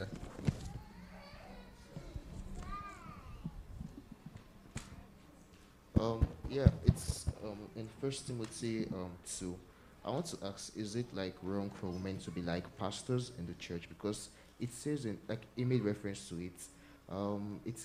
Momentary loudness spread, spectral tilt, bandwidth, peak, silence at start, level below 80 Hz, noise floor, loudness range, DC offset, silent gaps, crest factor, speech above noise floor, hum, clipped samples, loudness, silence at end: 18 LU; -6 dB/octave; 15.5 kHz; -10 dBFS; 0 s; -50 dBFS; -60 dBFS; 13 LU; under 0.1%; none; 30 dB; 22 dB; none; under 0.1%; -40 LUFS; 0 s